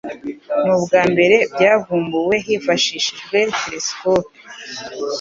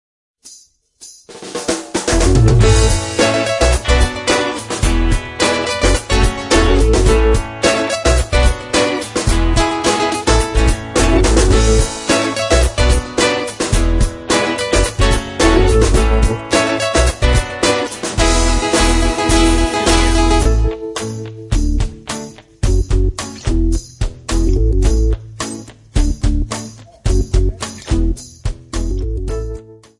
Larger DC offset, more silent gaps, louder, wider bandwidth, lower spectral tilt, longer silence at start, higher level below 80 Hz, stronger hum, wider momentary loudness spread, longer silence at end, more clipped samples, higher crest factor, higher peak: neither; neither; about the same, -17 LUFS vs -15 LUFS; second, 7.6 kHz vs 11.5 kHz; about the same, -3.5 dB/octave vs -4.5 dB/octave; second, 0.05 s vs 0.45 s; second, -56 dBFS vs -18 dBFS; neither; first, 16 LU vs 11 LU; second, 0 s vs 0.25 s; neither; about the same, 16 dB vs 14 dB; about the same, 0 dBFS vs 0 dBFS